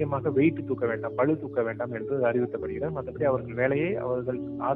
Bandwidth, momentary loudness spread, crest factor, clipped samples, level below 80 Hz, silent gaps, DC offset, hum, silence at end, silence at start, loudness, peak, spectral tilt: 4 kHz; 7 LU; 16 dB; under 0.1%; -56 dBFS; none; under 0.1%; none; 0 s; 0 s; -28 LUFS; -10 dBFS; -11 dB/octave